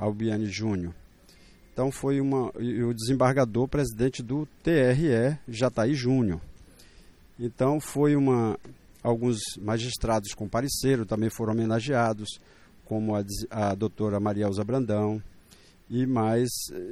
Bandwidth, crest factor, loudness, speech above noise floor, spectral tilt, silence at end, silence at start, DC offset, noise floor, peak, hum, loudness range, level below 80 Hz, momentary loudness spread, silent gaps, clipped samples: 16 kHz; 18 dB; -27 LUFS; 29 dB; -6 dB/octave; 0 s; 0 s; under 0.1%; -55 dBFS; -10 dBFS; none; 3 LU; -50 dBFS; 10 LU; none; under 0.1%